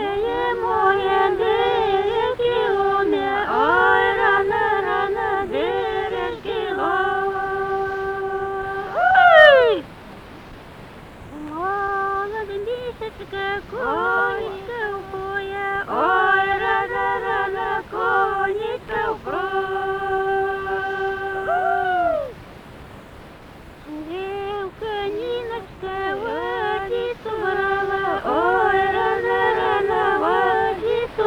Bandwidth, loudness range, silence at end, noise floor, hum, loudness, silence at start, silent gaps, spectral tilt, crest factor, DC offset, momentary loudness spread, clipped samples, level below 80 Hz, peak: 12.5 kHz; 10 LU; 0 s; -41 dBFS; none; -20 LUFS; 0 s; none; -5.5 dB/octave; 20 dB; under 0.1%; 13 LU; under 0.1%; -46 dBFS; 0 dBFS